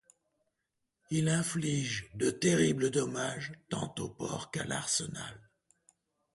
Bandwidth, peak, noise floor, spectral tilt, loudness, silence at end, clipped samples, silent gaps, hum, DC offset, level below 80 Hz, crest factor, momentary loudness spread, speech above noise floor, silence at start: 11.5 kHz; -14 dBFS; -84 dBFS; -4.5 dB/octave; -33 LUFS; 0.95 s; under 0.1%; none; none; under 0.1%; -64 dBFS; 20 dB; 11 LU; 52 dB; 1.1 s